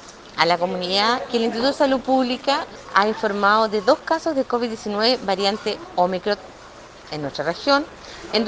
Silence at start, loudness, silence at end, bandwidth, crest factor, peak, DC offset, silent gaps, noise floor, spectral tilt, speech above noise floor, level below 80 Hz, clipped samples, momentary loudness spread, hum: 0 s; -21 LUFS; 0 s; 9.6 kHz; 22 dB; 0 dBFS; under 0.1%; none; -42 dBFS; -4 dB/octave; 21 dB; -54 dBFS; under 0.1%; 9 LU; none